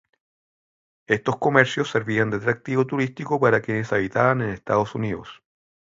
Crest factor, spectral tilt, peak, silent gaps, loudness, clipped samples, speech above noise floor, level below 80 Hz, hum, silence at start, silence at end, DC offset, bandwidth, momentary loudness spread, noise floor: 22 dB; -6.5 dB/octave; 0 dBFS; none; -22 LUFS; under 0.1%; over 68 dB; -56 dBFS; none; 1.1 s; 0.6 s; under 0.1%; 7.8 kHz; 7 LU; under -90 dBFS